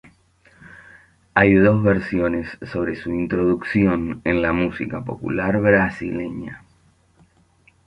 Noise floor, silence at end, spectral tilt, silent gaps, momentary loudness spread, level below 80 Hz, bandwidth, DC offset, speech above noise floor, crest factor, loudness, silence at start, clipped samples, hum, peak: -58 dBFS; 1.3 s; -9 dB/octave; none; 13 LU; -44 dBFS; 9.4 kHz; under 0.1%; 38 dB; 20 dB; -20 LUFS; 0.65 s; under 0.1%; none; -2 dBFS